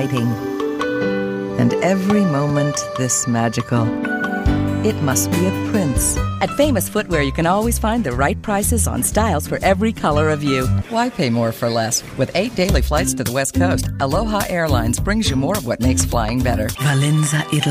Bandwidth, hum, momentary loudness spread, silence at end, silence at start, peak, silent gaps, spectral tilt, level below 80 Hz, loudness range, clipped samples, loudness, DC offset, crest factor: 16 kHz; none; 4 LU; 0 s; 0 s; -2 dBFS; none; -5 dB/octave; -30 dBFS; 1 LU; under 0.1%; -18 LUFS; under 0.1%; 16 dB